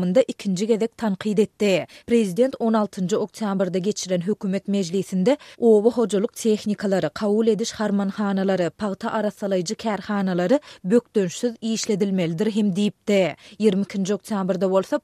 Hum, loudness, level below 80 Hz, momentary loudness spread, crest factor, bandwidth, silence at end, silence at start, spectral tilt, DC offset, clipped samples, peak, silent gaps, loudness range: none; -22 LUFS; -64 dBFS; 5 LU; 16 dB; 13.5 kHz; 0.05 s; 0 s; -6 dB/octave; under 0.1%; under 0.1%; -4 dBFS; none; 2 LU